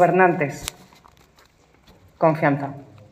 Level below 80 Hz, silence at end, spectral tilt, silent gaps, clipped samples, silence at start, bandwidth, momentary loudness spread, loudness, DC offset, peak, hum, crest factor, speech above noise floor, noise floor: -54 dBFS; 0.3 s; -6 dB/octave; none; under 0.1%; 0 s; 15.5 kHz; 16 LU; -21 LUFS; under 0.1%; -2 dBFS; none; 20 dB; 36 dB; -56 dBFS